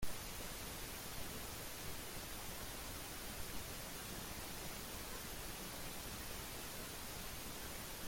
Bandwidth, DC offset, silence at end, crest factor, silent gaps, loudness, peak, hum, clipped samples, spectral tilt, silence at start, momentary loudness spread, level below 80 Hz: 17 kHz; under 0.1%; 0 s; 18 dB; none; -47 LUFS; -28 dBFS; none; under 0.1%; -2.5 dB/octave; 0 s; 0 LU; -56 dBFS